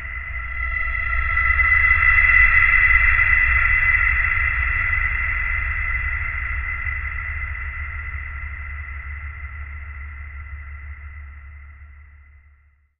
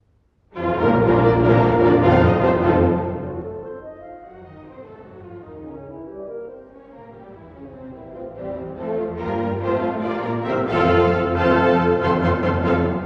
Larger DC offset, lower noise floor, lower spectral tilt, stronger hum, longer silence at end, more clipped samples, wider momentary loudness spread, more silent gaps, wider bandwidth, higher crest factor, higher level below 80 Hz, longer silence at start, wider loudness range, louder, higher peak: neither; second, -56 dBFS vs -60 dBFS; second, -7 dB/octave vs -9.5 dB/octave; neither; first, 0.95 s vs 0 s; neither; about the same, 22 LU vs 23 LU; neither; second, 4.2 kHz vs 6.6 kHz; about the same, 18 dB vs 18 dB; first, -28 dBFS vs -40 dBFS; second, 0 s vs 0.55 s; about the same, 21 LU vs 20 LU; about the same, -17 LUFS vs -19 LUFS; about the same, -2 dBFS vs -2 dBFS